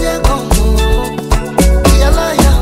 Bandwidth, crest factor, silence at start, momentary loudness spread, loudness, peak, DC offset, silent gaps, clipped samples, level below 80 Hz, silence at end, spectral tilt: 16 kHz; 10 dB; 0 s; 6 LU; -12 LUFS; 0 dBFS; under 0.1%; none; 0.1%; -12 dBFS; 0 s; -5 dB/octave